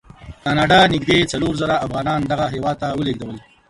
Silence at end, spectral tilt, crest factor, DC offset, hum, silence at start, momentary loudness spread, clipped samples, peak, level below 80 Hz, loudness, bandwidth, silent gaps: 0.3 s; -5 dB/octave; 18 dB; under 0.1%; none; 0.2 s; 11 LU; under 0.1%; -2 dBFS; -42 dBFS; -18 LUFS; 11.5 kHz; none